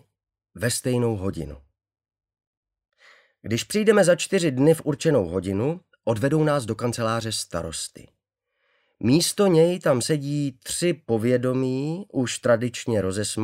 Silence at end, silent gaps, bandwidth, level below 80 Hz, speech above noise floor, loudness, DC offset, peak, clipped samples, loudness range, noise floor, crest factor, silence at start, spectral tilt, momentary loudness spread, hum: 0 s; 2.47-2.63 s; 16 kHz; -54 dBFS; 54 dB; -23 LUFS; under 0.1%; -6 dBFS; under 0.1%; 5 LU; -76 dBFS; 18 dB; 0.55 s; -5 dB/octave; 10 LU; none